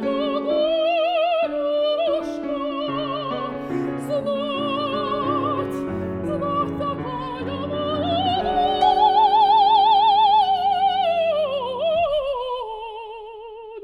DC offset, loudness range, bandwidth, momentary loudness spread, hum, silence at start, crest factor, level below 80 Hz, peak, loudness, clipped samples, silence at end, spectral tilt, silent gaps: under 0.1%; 8 LU; 11 kHz; 13 LU; none; 0 s; 16 dB; -52 dBFS; -6 dBFS; -21 LUFS; under 0.1%; 0 s; -6.5 dB/octave; none